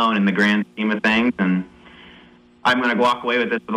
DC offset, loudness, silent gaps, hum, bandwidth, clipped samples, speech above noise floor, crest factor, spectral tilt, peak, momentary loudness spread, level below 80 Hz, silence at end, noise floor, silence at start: under 0.1%; -19 LUFS; none; 60 Hz at -45 dBFS; 11 kHz; under 0.1%; 30 dB; 14 dB; -6 dB/octave; -6 dBFS; 6 LU; -56 dBFS; 0 s; -49 dBFS; 0 s